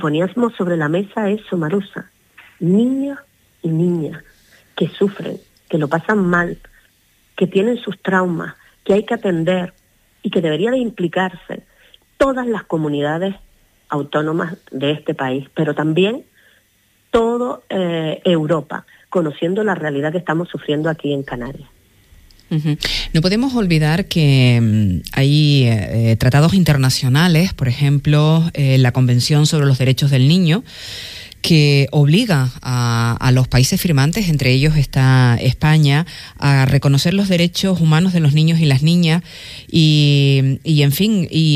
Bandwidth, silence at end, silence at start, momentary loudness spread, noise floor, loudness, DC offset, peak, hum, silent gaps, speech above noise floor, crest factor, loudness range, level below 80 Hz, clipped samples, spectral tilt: 15.5 kHz; 0 s; 0 s; 12 LU; -58 dBFS; -16 LUFS; under 0.1%; -2 dBFS; none; none; 43 dB; 14 dB; 7 LU; -40 dBFS; under 0.1%; -6 dB/octave